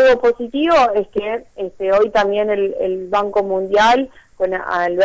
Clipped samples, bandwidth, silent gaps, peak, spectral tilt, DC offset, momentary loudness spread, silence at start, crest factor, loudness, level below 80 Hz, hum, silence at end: under 0.1%; 8 kHz; none; -6 dBFS; -4.5 dB/octave; under 0.1%; 10 LU; 0 s; 10 dB; -17 LUFS; -50 dBFS; none; 0 s